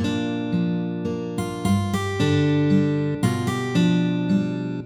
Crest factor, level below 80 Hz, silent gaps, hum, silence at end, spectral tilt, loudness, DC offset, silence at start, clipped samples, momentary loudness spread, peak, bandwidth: 14 dB; -52 dBFS; none; none; 0 s; -7 dB/octave; -22 LUFS; under 0.1%; 0 s; under 0.1%; 7 LU; -8 dBFS; 14.5 kHz